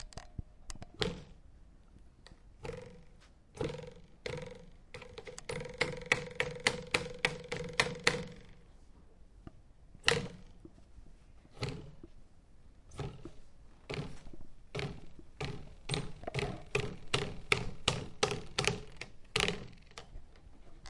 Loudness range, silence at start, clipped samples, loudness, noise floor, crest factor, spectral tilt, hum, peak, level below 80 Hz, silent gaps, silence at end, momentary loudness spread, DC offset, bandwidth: 12 LU; 0 s; under 0.1%; -37 LUFS; -58 dBFS; 32 dB; -3.5 dB/octave; none; -8 dBFS; -54 dBFS; none; 0 s; 23 LU; under 0.1%; 11.5 kHz